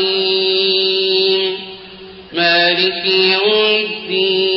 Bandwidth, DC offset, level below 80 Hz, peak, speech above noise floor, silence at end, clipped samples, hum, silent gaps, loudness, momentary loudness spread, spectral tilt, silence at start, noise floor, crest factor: 5.8 kHz; under 0.1%; -60 dBFS; -2 dBFS; 21 dB; 0 s; under 0.1%; none; none; -13 LUFS; 9 LU; -7.5 dB/octave; 0 s; -35 dBFS; 12 dB